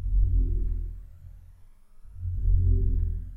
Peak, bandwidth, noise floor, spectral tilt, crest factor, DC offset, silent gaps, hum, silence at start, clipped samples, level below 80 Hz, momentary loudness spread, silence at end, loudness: -10 dBFS; 0.5 kHz; -50 dBFS; -11.5 dB/octave; 16 dB; under 0.1%; none; none; 0 s; under 0.1%; -26 dBFS; 20 LU; 0 s; -29 LUFS